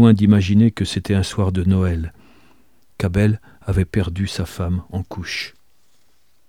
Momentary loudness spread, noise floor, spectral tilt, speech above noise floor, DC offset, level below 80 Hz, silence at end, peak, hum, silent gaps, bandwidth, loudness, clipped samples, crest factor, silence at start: 13 LU; -63 dBFS; -7 dB/octave; 46 dB; 0.3%; -38 dBFS; 1 s; -2 dBFS; none; none; 13.5 kHz; -19 LUFS; under 0.1%; 18 dB; 0 s